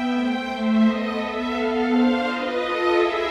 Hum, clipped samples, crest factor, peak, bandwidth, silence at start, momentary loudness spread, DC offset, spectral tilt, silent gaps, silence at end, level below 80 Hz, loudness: none; under 0.1%; 14 dB; -8 dBFS; 8.4 kHz; 0 s; 5 LU; under 0.1%; -6 dB/octave; none; 0 s; -52 dBFS; -22 LUFS